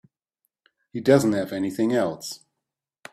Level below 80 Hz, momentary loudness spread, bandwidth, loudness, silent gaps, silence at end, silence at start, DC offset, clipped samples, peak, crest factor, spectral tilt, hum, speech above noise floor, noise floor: -64 dBFS; 17 LU; 15.5 kHz; -23 LUFS; none; 0.75 s; 0.95 s; under 0.1%; under 0.1%; -4 dBFS; 22 dB; -6 dB/octave; none; 63 dB; -85 dBFS